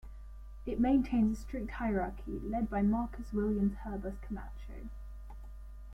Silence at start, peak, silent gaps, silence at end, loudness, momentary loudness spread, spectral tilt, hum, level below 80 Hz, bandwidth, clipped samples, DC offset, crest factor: 0.05 s; -18 dBFS; none; 0 s; -34 LUFS; 21 LU; -8.5 dB/octave; none; -44 dBFS; 8.8 kHz; under 0.1%; under 0.1%; 16 dB